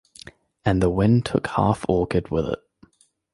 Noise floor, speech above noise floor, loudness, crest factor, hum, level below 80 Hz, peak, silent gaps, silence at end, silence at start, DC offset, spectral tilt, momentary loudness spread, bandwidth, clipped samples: -56 dBFS; 36 dB; -22 LUFS; 18 dB; none; -40 dBFS; -4 dBFS; none; 0.8 s; 0.65 s; under 0.1%; -7.5 dB/octave; 8 LU; 11.5 kHz; under 0.1%